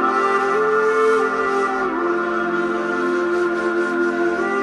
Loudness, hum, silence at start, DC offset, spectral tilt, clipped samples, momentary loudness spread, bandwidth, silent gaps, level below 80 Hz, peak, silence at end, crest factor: -19 LUFS; none; 0 s; under 0.1%; -5 dB/octave; under 0.1%; 4 LU; 11 kHz; none; -56 dBFS; -6 dBFS; 0 s; 12 dB